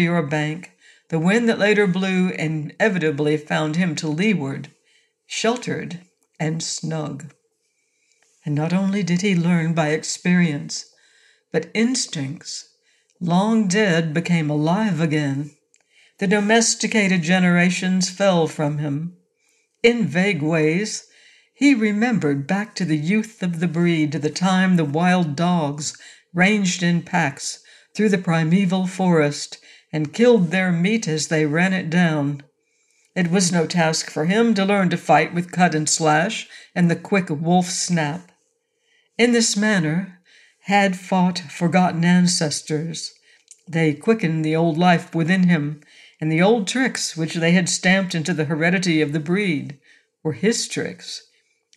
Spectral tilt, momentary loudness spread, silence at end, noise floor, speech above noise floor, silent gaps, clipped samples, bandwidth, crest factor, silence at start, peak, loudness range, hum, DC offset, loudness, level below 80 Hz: -5 dB/octave; 12 LU; 0.6 s; -69 dBFS; 50 dB; none; under 0.1%; 12 kHz; 18 dB; 0 s; -4 dBFS; 4 LU; none; under 0.1%; -20 LUFS; -68 dBFS